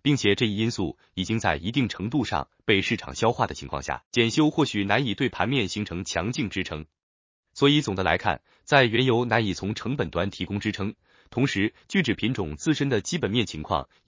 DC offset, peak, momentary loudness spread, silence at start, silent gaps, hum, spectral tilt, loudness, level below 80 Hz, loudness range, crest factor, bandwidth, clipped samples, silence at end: under 0.1%; -2 dBFS; 10 LU; 0.05 s; 4.06-4.11 s, 7.03-7.43 s; none; -5 dB/octave; -25 LUFS; -48 dBFS; 3 LU; 22 dB; 7.6 kHz; under 0.1%; 0.25 s